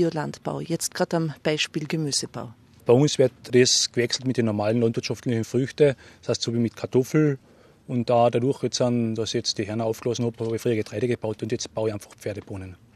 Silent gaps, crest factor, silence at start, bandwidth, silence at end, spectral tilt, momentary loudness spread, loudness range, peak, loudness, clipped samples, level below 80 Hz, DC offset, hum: none; 20 dB; 0 s; 13.5 kHz; 0.2 s; -4.5 dB/octave; 12 LU; 4 LU; -4 dBFS; -24 LUFS; under 0.1%; -64 dBFS; under 0.1%; none